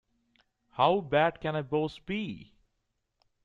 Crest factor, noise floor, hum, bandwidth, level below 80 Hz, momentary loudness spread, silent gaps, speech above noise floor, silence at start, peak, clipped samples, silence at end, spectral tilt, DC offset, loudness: 22 dB; -80 dBFS; none; 7.6 kHz; -62 dBFS; 15 LU; none; 51 dB; 0.75 s; -10 dBFS; under 0.1%; 1 s; -7.5 dB/octave; under 0.1%; -29 LUFS